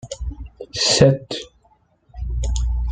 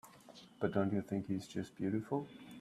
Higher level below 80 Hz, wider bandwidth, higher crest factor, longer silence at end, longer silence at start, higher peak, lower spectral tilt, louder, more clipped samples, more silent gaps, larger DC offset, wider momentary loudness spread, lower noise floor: first, -28 dBFS vs -74 dBFS; second, 9.4 kHz vs 14 kHz; about the same, 20 dB vs 20 dB; about the same, 0 s vs 0 s; about the same, 0.05 s vs 0.05 s; first, -2 dBFS vs -20 dBFS; second, -4.5 dB/octave vs -7.5 dB/octave; first, -19 LUFS vs -39 LUFS; neither; neither; neither; about the same, 20 LU vs 20 LU; about the same, -59 dBFS vs -59 dBFS